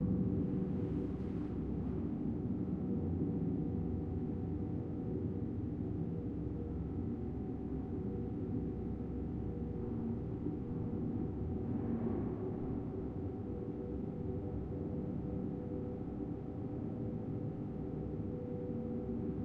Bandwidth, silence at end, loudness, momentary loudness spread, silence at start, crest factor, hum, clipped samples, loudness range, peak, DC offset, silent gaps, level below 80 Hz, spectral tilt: 4.7 kHz; 0 s; -40 LUFS; 4 LU; 0 s; 14 dB; none; under 0.1%; 3 LU; -24 dBFS; under 0.1%; none; -50 dBFS; -12 dB/octave